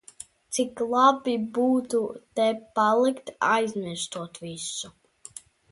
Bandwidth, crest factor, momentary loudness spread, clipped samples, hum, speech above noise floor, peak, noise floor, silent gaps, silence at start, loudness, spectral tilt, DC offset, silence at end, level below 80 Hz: 11.5 kHz; 20 dB; 22 LU; under 0.1%; none; 23 dB; -6 dBFS; -48 dBFS; none; 0.5 s; -25 LUFS; -3.5 dB/octave; under 0.1%; 0.35 s; -68 dBFS